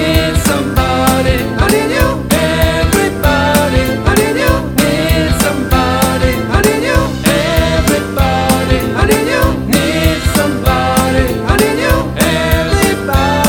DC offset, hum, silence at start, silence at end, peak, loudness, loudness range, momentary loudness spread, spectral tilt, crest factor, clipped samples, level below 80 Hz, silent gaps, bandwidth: under 0.1%; none; 0 s; 0 s; 0 dBFS; -12 LUFS; 1 LU; 2 LU; -5 dB/octave; 12 dB; 0.2%; -20 dBFS; none; 19 kHz